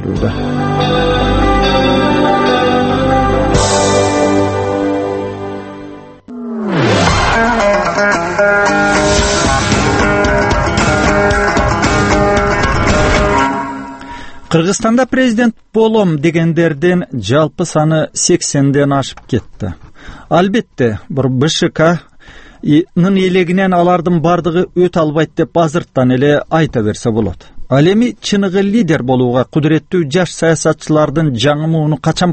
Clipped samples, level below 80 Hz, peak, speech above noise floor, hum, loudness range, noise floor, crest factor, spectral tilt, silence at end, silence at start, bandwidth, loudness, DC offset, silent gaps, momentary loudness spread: under 0.1%; -26 dBFS; 0 dBFS; 25 dB; none; 3 LU; -37 dBFS; 12 dB; -5 dB/octave; 0 s; 0 s; 8.8 kHz; -12 LUFS; under 0.1%; none; 7 LU